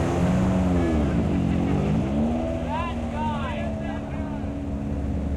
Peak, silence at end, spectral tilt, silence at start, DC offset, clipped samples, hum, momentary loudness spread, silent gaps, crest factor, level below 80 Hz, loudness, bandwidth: -14 dBFS; 0 s; -8 dB/octave; 0 s; under 0.1%; under 0.1%; none; 8 LU; none; 10 dB; -34 dBFS; -25 LUFS; 11 kHz